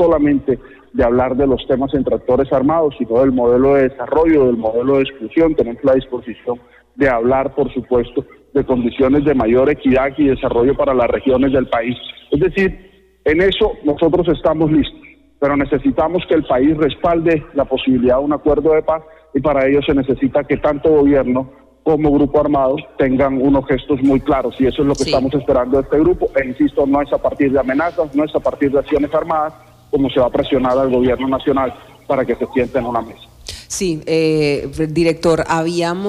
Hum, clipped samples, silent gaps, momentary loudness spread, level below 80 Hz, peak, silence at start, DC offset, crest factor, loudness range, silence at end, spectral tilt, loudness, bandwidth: none; under 0.1%; none; 7 LU; -36 dBFS; -4 dBFS; 0 s; under 0.1%; 10 dB; 3 LU; 0 s; -6.5 dB/octave; -16 LUFS; 12 kHz